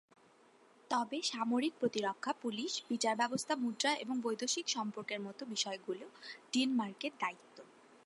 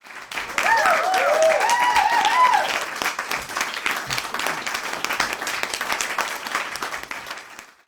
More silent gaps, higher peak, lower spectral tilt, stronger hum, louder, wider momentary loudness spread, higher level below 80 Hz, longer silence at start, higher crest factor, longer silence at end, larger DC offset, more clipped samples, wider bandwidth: neither; second, -18 dBFS vs -2 dBFS; first, -2.5 dB/octave vs -0.5 dB/octave; neither; second, -37 LUFS vs -21 LUFS; second, 8 LU vs 12 LU; second, under -90 dBFS vs -58 dBFS; first, 0.9 s vs 0.05 s; about the same, 20 dB vs 20 dB; first, 0.4 s vs 0.2 s; neither; neither; second, 11.5 kHz vs over 20 kHz